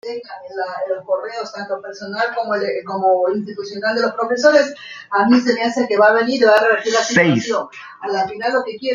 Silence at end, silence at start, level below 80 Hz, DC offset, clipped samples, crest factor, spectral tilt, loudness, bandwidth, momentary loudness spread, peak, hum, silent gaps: 0 s; 0.05 s; -64 dBFS; under 0.1%; under 0.1%; 16 dB; -4.5 dB/octave; -17 LUFS; 9.4 kHz; 14 LU; -2 dBFS; none; none